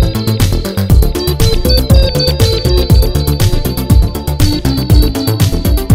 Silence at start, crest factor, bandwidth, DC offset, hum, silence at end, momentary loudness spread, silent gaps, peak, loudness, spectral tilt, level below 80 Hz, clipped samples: 0 s; 10 dB; 16.5 kHz; under 0.1%; none; 0 s; 4 LU; none; 0 dBFS; -12 LUFS; -6 dB/octave; -14 dBFS; 2%